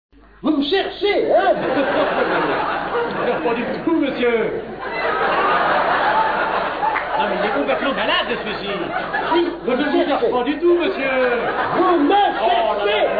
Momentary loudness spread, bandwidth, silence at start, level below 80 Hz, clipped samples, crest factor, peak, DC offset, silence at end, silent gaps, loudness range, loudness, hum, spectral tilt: 6 LU; 5 kHz; 0.45 s; -48 dBFS; under 0.1%; 12 dB; -6 dBFS; under 0.1%; 0 s; none; 3 LU; -18 LUFS; none; -7.5 dB/octave